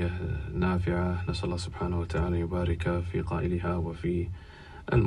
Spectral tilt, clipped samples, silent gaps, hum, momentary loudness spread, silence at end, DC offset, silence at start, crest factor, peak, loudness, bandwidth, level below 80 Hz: -7.5 dB/octave; under 0.1%; none; none; 5 LU; 0 s; under 0.1%; 0 s; 18 dB; -12 dBFS; -31 LUFS; 10.5 kHz; -40 dBFS